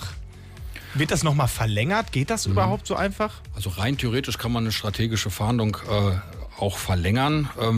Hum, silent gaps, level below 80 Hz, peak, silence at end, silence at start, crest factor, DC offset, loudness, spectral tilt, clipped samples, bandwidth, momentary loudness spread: none; none; -40 dBFS; -10 dBFS; 0 s; 0 s; 14 dB; under 0.1%; -24 LUFS; -5 dB/octave; under 0.1%; 15.5 kHz; 10 LU